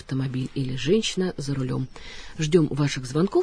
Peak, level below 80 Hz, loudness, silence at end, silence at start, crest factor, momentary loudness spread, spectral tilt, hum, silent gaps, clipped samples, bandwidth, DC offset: -6 dBFS; -46 dBFS; -25 LUFS; 0 s; 0 s; 18 dB; 9 LU; -6 dB/octave; none; none; under 0.1%; 10.5 kHz; under 0.1%